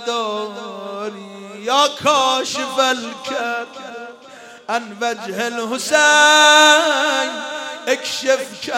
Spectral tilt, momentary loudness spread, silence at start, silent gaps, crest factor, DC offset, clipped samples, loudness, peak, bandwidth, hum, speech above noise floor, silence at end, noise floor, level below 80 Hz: -0.5 dB/octave; 21 LU; 0 s; none; 18 dB; under 0.1%; under 0.1%; -16 LUFS; 0 dBFS; 16.5 kHz; none; 23 dB; 0 s; -40 dBFS; -70 dBFS